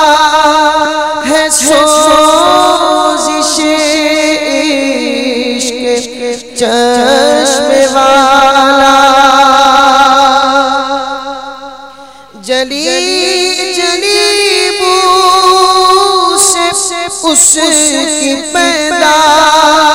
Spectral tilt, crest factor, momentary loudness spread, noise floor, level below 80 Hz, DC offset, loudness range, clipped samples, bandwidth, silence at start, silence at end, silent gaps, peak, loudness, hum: -0.5 dB/octave; 8 dB; 8 LU; -32 dBFS; -42 dBFS; 0.6%; 6 LU; 2%; over 20 kHz; 0 s; 0 s; none; 0 dBFS; -7 LUFS; 50 Hz at -45 dBFS